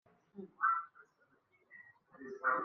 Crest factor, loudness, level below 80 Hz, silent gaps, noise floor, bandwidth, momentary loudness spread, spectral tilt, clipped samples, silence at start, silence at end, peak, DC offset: 20 dB; -36 LUFS; under -90 dBFS; none; -74 dBFS; 6.2 kHz; 23 LU; -4.5 dB/octave; under 0.1%; 0.35 s; 0 s; -20 dBFS; under 0.1%